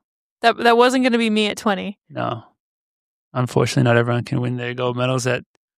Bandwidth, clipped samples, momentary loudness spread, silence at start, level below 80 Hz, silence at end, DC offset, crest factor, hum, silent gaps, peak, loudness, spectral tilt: 14.5 kHz; under 0.1%; 12 LU; 0.45 s; -60 dBFS; 0.35 s; under 0.1%; 18 dB; none; 2.60-3.31 s; -2 dBFS; -19 LUFS; -5.5 dB/octave